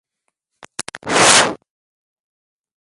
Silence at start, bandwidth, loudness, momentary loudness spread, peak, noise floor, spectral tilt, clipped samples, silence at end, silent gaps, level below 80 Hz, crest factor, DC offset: 0.95 s; 16 kHz; -12 LUFS; 20 LU; 0 dBFS; -75 dBFS; -1 dB/octave; under 0.1%; 1.25 s; none; -56 dBFS; 20 dB; under 0.1%